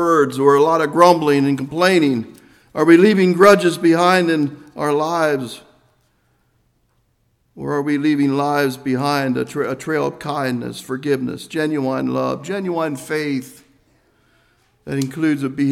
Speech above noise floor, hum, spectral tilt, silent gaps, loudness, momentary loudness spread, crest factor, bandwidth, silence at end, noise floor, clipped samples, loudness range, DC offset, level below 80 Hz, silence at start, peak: 47 dB; none; -6 dB/octave; none; -17 LUFS; 13 LU; 18 dB; 15.5 kHz; 0 s; -63 dBFS; under 0.1%; 10 LU; under 0.1%; -60 dBFS; 0 s; 0 dBFS